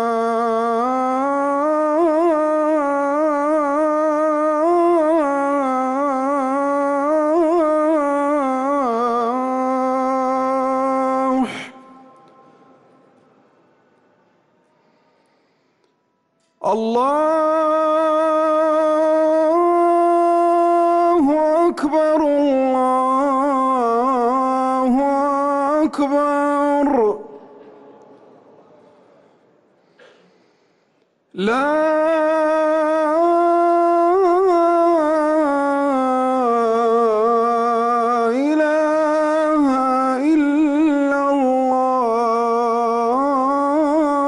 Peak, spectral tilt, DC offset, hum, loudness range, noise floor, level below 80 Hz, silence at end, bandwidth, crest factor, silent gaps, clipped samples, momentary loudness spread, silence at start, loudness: -8 dBFS; -5.5 dB/octave; under 0.1%; none; 7 LU; -66 dBFS; -60 dBFS; 0 s; 11.5 kHz; 8 dB; none; under 0.1%; 4 LU; 0 s; -17 LUFS